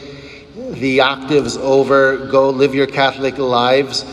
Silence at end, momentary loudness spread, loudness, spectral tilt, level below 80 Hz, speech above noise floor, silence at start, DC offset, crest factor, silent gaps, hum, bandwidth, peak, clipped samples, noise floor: 0 s; 17 LU; -14 LUFS; -4.5 dB/octave; -48 dBFS; 20 dB; 0 s; under 0.1%; 14 dB; none; none; 11 kHz; 0 dBFS; under 0.1%; -35 dBFS